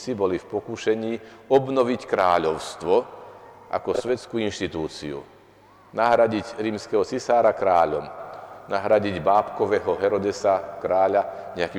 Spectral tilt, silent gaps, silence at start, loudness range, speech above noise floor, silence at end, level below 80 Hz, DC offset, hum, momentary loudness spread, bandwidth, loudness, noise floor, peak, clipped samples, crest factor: -5.5 dB/octave; none; 0 s; 4 LU; 29 dB; 0 s; -58 dBFS; under 0.1%; none; 12 LU; 18 kHz; -23 LUFS; -52 dBFS; -8 dBFS; under 0.1%; 16 dB